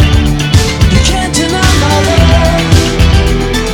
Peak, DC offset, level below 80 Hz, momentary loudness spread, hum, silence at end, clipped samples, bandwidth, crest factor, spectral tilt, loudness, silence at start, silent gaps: 0 dBFS; under 0.1%; -14 dBFS; 3 LU; none; 0 s; 0.9%; 17.5 kHz; 8 dB; -5 dB/octave; -9 LUFS; 0 s; none